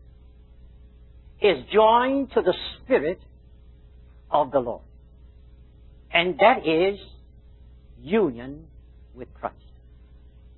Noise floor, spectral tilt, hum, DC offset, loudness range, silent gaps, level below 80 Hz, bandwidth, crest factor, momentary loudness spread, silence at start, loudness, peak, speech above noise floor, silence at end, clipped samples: -49 dBFS; -9.5 dB/octave; none; under 0.1%; 7 LU; none; -50 dBFS; 4.3 kHz; 24 dB; 21 LU; 1.4 s; -22 LUFS; -2 dBFS; 27 dB; 1.05 s; under 0.1%